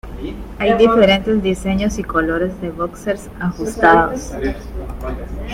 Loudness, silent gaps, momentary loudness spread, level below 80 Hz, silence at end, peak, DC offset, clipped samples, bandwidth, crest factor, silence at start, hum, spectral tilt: -17 LUFS; none; 16 LU; -32 dBFS; 0 s; 0 dBFS; under 0.1%; under 0.1%; 16 kHz; 18 dB; 0.05 s; none; -5.5 dB/octave